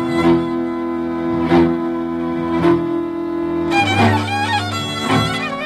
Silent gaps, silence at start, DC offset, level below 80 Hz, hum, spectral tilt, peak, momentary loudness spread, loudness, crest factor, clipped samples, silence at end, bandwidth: none; 0 s; under 0.1%; -44 dBFS; none; -6 dB/octave; -2 dBFS; 7 LU; -17 LUFS; 16 dB; under 0.1%; 0 s; 12.5 kHz